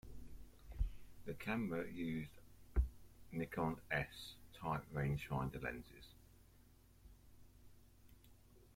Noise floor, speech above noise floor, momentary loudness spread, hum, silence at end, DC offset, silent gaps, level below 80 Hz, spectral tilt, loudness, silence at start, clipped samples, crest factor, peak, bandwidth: -66 dBFS; 23 dB; 20 LU; none; 0 s; under 0.1%; none; -52 dBFS; -7 dB/octave; -45 LUFS; 0.05 s; under 0.1%; 22 dB; -24 dBFS; 16.5 kHz